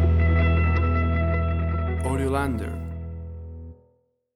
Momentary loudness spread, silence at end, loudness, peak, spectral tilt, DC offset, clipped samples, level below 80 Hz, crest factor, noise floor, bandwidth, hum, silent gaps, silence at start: 18 LU; 0.65 s; -24 LUFS; -10 dBFS; -8 dB/octave; under 0.1%; under 0.1%; -28 dBFS; 14 dB; -66 dBFS; 11.5 kHz; none; none; 0 s